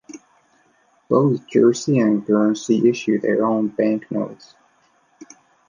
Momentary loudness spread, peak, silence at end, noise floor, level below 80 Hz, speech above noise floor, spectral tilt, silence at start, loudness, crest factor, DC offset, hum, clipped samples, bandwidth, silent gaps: 6 LU; -2 dBFS; 0.45 s; -60 dBFS; -68 dBFS; 42 dB; -6.5 dB/octave; 0.1 s; -19 LUFS; 18 dB; under 0.1%; none; under 0.1%; 9.8 kHz; none